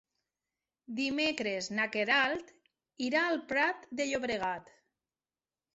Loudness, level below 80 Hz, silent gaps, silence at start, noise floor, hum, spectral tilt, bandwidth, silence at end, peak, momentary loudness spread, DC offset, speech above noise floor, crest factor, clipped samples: -32 LUFS; -72 dBFS; none; 0.9 s; under -90 dBFS; none; -1 dB/octave; 8 kHz; 1.15 s; -14 dBFS; 10 LU; under 0.1%; over 58 dB; 20 dB; under 0.1%